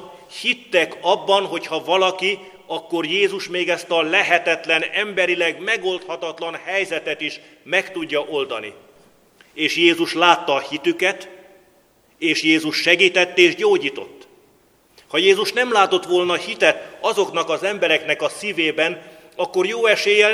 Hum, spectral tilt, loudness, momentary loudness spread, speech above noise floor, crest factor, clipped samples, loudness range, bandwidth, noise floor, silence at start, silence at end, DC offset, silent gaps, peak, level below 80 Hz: none; -3 dB/octave; -18 LUFS; 12 LU; 37 dB; 20 dB; under 0.1%; 4 LU; 15 kHz; -56 dBFS; 0 s; 0 s; under 0.1%; none; 0 dBFS; -70 dBFS